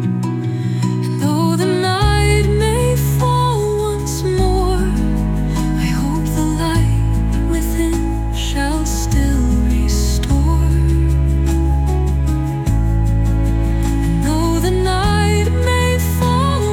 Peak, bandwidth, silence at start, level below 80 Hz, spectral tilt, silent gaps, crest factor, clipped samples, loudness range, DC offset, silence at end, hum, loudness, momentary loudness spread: -4 dBFS; 17 kHz; 0 s; -20 dBFS; -6 dB/octave; none; 10 dB; under 0.1%; 2 LU; under 0.1%; 0 s; none; -16 LUFS; 4 LU